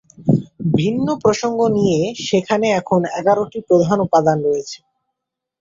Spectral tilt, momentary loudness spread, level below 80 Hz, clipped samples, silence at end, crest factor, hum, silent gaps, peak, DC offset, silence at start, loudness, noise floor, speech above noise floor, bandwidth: -6.5 dB/octave; 5 LU; -54 dBFS; under 0.1%; 0.85 s; 16 dB; none; none; -2 dBFS; under 0.1%; 0.2 s; -17 LUFS; -81 dBFS; 64 dB; 7.8 kHz